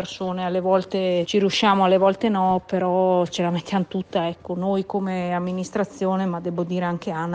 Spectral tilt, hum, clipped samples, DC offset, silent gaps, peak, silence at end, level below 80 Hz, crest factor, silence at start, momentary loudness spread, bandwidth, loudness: -6 dB/octave; none; under 0.1%; under 0.1%; none; -8 dBFS; 0 s; -60 dBFS; 14 dB; 0 s; 8 LU; 9 kHz; -22 LUFS